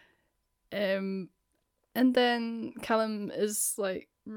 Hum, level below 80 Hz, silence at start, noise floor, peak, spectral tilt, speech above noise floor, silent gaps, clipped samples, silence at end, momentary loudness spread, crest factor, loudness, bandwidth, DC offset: none; -72 dBFS; 0.7 s; -77 dBFS; -14 dBFS; -3.5 dB/octave; 47 dB; none; under 0.1%; 0 s; 13 LU; 16 dB; -30 LUFS; 19 kHz; under 0.1%